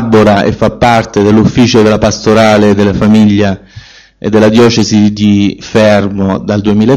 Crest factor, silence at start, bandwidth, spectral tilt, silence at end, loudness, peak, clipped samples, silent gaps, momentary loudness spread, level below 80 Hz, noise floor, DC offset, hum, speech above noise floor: 8 dB; 0 s; 9.6 kHz; -6 dB/octave; 0 s; -8 LUFS; 0 dBFS; 2%; none; 6 LU; -32 dBFS; -33 dBFS; under 0.1%; none; 26 dB